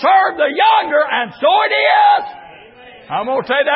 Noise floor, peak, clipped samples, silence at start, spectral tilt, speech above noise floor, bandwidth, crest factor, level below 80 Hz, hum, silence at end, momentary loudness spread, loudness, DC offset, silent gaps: -39 dBFS; -2 dBFS; under 0.1%; 0 s; -8 dB/octave; 26 dB; 5.8 kHz; 14 dB; -62 dBFS; none; 0 s; 9 LU; -14 LUFS; under 0.1%; none